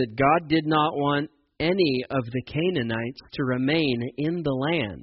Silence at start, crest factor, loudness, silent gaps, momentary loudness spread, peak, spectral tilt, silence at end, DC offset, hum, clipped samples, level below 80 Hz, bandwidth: 0 s; 16 dB; -25 LUFS; none; 8 LU; -8 dBFS; -4.5 dB/octave; 0 s; under 0.1%; none; under 0.1%; -54 dBFS; 5.8 kHz